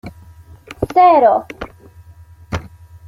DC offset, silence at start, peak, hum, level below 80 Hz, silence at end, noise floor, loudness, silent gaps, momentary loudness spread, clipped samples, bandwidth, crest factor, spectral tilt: under 0.1%; 0.05 s; -2 dBFS; none; -42 dBFS; 0.4 s; -42 dBFS; -13 LUFS; none; 23 LU; under 0.1%; 12 kHz; 16 dB; -7 dB/octave